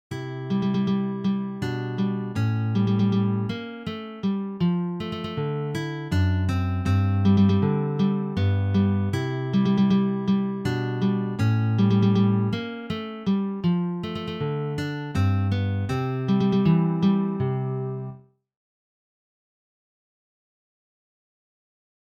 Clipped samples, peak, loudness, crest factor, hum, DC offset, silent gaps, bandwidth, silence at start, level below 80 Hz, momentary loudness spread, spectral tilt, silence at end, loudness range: under 0.1%; -10 dBFS; -24 LUFS; 16 dB; none; under 0.1%; none; 8 kHz; 0.1 s; -54 dBFS; 10 LU; -8.5 dB/octave; 3.9 s; 5 LU